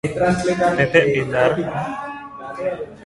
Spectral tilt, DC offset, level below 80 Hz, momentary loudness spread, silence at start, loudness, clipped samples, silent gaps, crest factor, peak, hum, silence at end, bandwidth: -6 dB/octave; under 0.1%; -48 dBFS; 15 LU; 0.05 s; -19 LUFS; under 0.1%; none; 20 dB; 0 dBFS; none; 0 s; 11.5 kHz